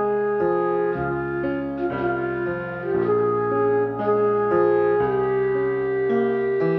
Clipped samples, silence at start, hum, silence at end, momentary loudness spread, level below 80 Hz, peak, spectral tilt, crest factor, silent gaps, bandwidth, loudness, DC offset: under 0.1%; 0 s; none; 0 s; 6 LU; -52 dBFS; -6 dBFS; -10 dB/octave; 14 dB; none; 4.4 kHz; -22 LUFS; under 0.1%